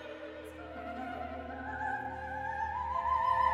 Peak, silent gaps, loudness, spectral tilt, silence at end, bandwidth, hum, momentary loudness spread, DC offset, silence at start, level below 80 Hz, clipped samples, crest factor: -18 dBFS; none; -36 LUFS; -6 dB/octave; 0 s; 12.5 kHz; none; 15 LU; under 0.1%; 0 s; -54 dBFS; under 0.1%; 18 dB